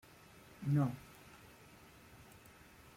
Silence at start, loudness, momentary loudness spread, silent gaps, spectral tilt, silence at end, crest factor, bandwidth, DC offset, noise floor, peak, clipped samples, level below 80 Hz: 0.6 s; -38 LUFS; 24 LU; none; -8 dB/octave; 0.6 s; 20 dB; 16 kHz; under 0.1%; -60 dBFS; -24 dBFS; under 0.1%; -70 dBFS